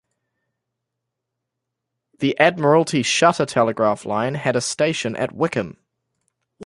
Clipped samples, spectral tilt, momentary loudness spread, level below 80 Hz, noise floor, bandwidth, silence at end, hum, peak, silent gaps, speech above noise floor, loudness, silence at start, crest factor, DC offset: under 0.1%; -4.5 dB/octave; 8 LU; -62 dBFS; -81 dBFS; 11.5 kHz; 0 s; none; -2 dBFS; none; 62 dB; -19 LUFS; 2.2 s; 20 dB; under 0.1%